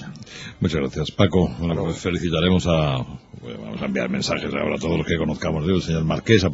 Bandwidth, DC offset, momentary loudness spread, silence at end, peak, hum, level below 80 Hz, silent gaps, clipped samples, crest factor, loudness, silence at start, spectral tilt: 8 kHz; under 0.1%; 16 LU; 0 s; -2 dBFS; none; -42 dBFS; none; under 0.1%; 20 dB; -22 LUFS; 0 s; -6 dB/octave